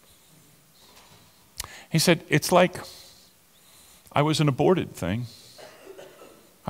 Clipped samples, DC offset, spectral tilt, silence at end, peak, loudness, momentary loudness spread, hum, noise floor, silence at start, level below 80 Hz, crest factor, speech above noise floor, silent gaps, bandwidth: under 0.1%; under 0.1%; -5 dB/octave; 0 s; -6 dBFS; -23 LUFS; 25 LU; none; -57 dBFS; 1.6 s; -58 dBFS; 22 dB; 34 dB; none; 16.5 kHz